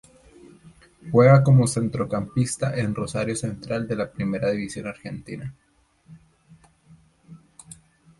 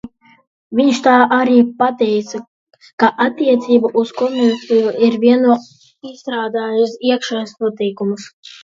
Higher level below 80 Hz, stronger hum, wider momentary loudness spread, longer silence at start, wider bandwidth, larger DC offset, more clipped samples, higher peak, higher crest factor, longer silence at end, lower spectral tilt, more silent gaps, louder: first, -54 dBFS vs -64 dBFS; neither; first, 21 LU vs 12 LU; first, 0.65 s vs 0.05 s; first, 11.5 kHz vs 7.6 kHz; neither; neither; second, -4 dBFS vs 0 dBFS; about the same, 20 dB vs 16 dB; first, 0.85 s vs 0.35 s; first, -6.5 dB/octave vs -5 dB/octave; second, none vs 0.47-0.70 s, 2.48-2.67 s, 2.93-2.98 s; second, -22 LUFS vs -15 LUFS